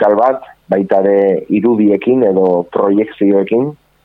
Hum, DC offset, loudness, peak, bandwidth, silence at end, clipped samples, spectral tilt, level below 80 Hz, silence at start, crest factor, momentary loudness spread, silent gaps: none; under 0.1%; -13 LUFS; 0 dBFS; 4.1 kHz; 0.3 s; under 0.1%; -10 dB/octave; -56 dBFS; 0 s; 12 dB; 6 LU; none